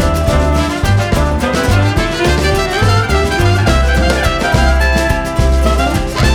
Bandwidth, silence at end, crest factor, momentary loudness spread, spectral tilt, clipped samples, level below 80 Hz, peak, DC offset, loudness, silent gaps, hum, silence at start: 15.5 kHz; 0 s; 12 dB; 2 LU; -5.5 dB/octave; under 0.1%; -16 dBFS; 0 dBFS; under 0.1%; -13 LUFS; none; none; 0 s